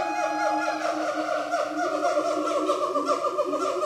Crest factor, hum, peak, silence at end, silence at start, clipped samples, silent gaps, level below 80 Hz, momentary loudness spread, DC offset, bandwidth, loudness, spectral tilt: 14 dB; none; -10 dBFS; 0 s; 0 s; under 0.1%; none; -74 dBFS; 2 LU; under 0.1%; 15 kHz; -26 LUFS; -3 dB/octave